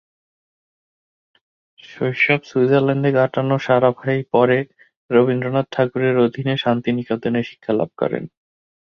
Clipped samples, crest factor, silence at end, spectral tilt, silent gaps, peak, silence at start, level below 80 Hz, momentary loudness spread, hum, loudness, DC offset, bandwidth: under 0.1%; 18 dB; 0.55 s; -8 dB/octave; 4.97-5.09 s; -2 dBFS; 1.9 s; -60 dBFS; 7 LU; none; -19 LUFS; under 0.1%; 6.8 kHz